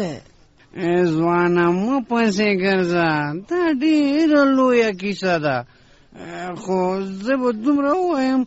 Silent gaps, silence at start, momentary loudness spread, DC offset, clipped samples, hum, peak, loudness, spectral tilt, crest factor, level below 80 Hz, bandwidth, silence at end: none; 0 s; 12 LU; under 0.1%; under 0.1%; none; -4 dBFS; -19 LUFS; -5 dB/octave; 14 dB; -56 dBFS; 8 kHz; 0 s